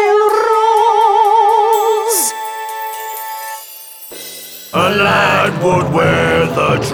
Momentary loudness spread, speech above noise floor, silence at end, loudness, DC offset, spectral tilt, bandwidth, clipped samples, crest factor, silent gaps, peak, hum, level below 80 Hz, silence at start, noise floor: 17 LU; 20 dB; 0 s; -13 LUFS; under 0.1%; -4 dB/octave; over 20 kHz; under 0.1%; 12 dB; none; -2 dBFS; none; -44 dBFS; 0 s; -33 dBFS